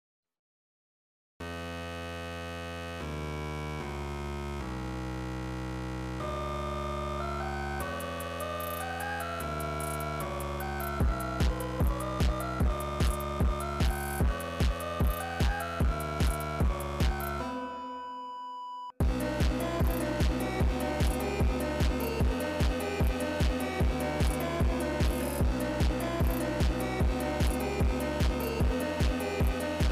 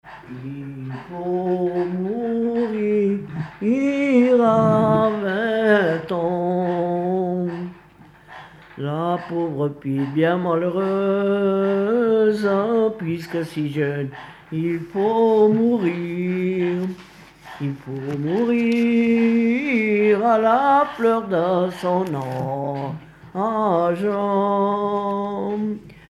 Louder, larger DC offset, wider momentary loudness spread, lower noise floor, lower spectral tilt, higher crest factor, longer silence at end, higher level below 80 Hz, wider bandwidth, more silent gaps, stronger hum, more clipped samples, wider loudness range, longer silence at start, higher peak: second, -32 LUFS vs -20 LUFS; neither; second, 7 LU vs 13 LU; first, under -90 dBFS vs -48 dBFS; second, -6 dB/octave vs -8 dB/octave; second, 8 dB vs 16 dB; second, 0 s vs 0.15 s; first, -34 dBFS vs -58 dBFS; first, 16 kHz vs 12 kHz; neither; neither; neither; about the same, 7 LU vs 5 LU; first, 1.4 s vs 0.05 s; second, -22 dBFS vs -6 dBFS